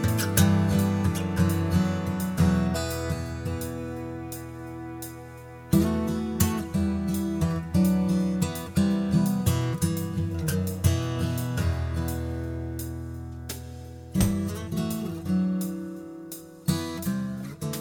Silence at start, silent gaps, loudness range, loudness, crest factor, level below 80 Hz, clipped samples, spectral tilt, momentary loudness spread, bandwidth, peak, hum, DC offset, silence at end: 0 s; none; 5 LU; -27 LUFS; 20 dB; -42 dBFS; under 0.1%; -6 dB/octave; 14 LU; 19.5 kHz; -6 dBFS; none; under 0.1%; 0 s